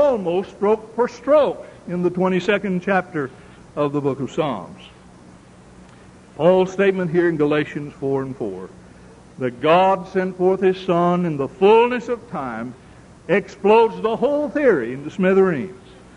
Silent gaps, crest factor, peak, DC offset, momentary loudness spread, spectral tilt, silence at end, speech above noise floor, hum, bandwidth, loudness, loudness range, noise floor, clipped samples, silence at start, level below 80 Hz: none; 16 dB; -4 dBFS; under 0.1%; 14 LU; -7 dB/octave; 0.4 s; 26 dB; none; 10.5 kHz; -19 LUFS; 5 LU; -45 dBFS; under 0.1%; 0 s; -54 dBFS